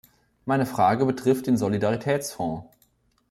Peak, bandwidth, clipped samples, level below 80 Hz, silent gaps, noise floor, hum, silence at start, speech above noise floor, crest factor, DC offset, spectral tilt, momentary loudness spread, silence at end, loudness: -8 dBFS; 16 kHz; under 0.1%; -60 dBFS; none; -65 dBFS; none; 0.45 s; 42 dB; 16 dB; under 0.1%; -6.5 dB/octave; 10 LU; 0.65 s; -24 LUFS